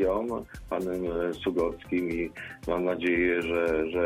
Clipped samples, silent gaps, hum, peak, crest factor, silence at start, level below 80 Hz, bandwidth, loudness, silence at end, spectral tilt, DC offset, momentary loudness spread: under 0.1%; none; none; -14 dBFS; 14 dB; 0 s; -48 dBFS; 15 kHz; -29 LUFS; 0 s; -6.5 dB/octave; under 0.1%; 9 LU